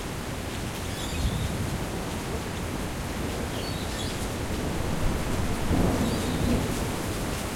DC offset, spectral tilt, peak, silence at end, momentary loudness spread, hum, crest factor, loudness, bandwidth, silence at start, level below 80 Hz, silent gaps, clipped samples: under 0.1%; -5 dB/octave; -10 dBFS; 0 s; 6 LU; none; 18 dB; -30 LUFS; 16.5 kHz; 0 s; -36 dBFS; none; under 0.1%